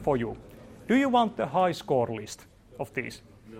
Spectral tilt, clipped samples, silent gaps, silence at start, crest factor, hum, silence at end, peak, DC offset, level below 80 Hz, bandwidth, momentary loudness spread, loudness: -6 dB/octave; under 0.1%; none; 0 s; 18 dB; none; 0 s; -10 dBFS; under 0.1%; -56 dBFS; 16 kHz; 21 LU; -27 LUFS